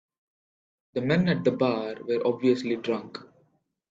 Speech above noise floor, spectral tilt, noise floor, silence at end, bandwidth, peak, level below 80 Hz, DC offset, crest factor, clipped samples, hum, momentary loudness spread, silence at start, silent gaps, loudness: 43 dB; -7.5 dB/octave; -69 dBFS; 0.65 s; 7.6 kHz; -10 dBFS; -64 dBFS; under 0.1%; 18 dB; under 0.1%; none; 10 LU; 0.95 s; none; -26 LUFS